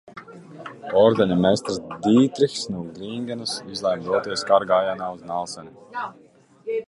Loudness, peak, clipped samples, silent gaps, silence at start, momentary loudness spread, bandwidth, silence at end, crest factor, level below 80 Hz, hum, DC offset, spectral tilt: -22 LUFS; -4 dBFS; under 0.1%; none; 0.05 s; 20 LU; 11.5 kHz; 0.05 s; 18 dB; -58 dBFS; none; under 0.1%; -5.5 dB/octave